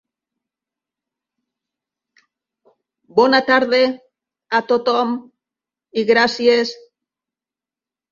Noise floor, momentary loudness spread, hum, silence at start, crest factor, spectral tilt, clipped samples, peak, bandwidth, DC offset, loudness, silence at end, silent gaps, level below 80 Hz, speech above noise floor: -90 dBFS; 11 LU; none; 3.15 s; 20 dB; -4 dB/octave; under 0.1%; -2 dBFS; 7.4 kHz; under 0.1%; -17 LUFS; 1.35 s; none; -66 dBFS; 74 dB